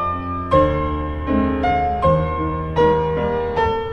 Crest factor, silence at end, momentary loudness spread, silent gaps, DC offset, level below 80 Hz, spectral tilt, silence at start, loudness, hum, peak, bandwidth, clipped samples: 16 dB; 0 s; 6 LU; none; under 0.1%; -30 dBFS; -8.5 dB/octave; 0 s; -19 LUFS; none; -2 dBFS; 7.6 kHz; under 0.1%